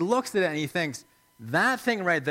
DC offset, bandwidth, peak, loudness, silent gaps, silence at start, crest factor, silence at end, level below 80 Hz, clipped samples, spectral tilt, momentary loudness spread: under 0.1%; 16.5 kHz; -10 dBFS; -26 LUFS; none; 0 s; 16 dB; 0 s; -70 dBFS; under 0.1%; -4.5 dB/octave; 10 LU